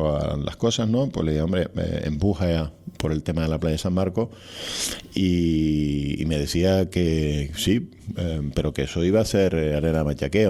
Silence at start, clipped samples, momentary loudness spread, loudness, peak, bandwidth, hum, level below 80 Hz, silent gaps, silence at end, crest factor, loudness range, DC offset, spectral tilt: 0 s; under 0.1%; 6 LU; -24 LUFS; -4 dBFS; 14.5 kHz; none; -38 dBFS; none; 0 s; 20 dB; 2 LU; under 0.1%; -6 dB/octave